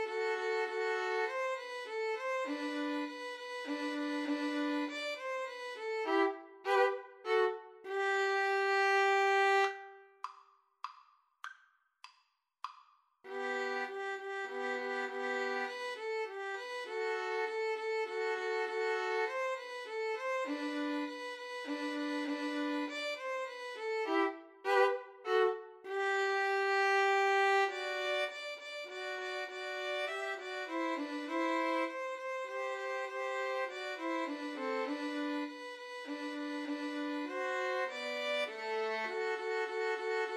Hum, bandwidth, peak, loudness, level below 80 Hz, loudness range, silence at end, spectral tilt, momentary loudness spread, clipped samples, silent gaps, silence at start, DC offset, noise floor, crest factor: none; 13 kHz; -16 dBFS; -35 LUFS; under -90 dBFS; 7 LU; 0 s; -1.5 dB/octave; 12 LU; under 0.1%; none; 0 s; under 0.1%; -75 dBFS; 20 dB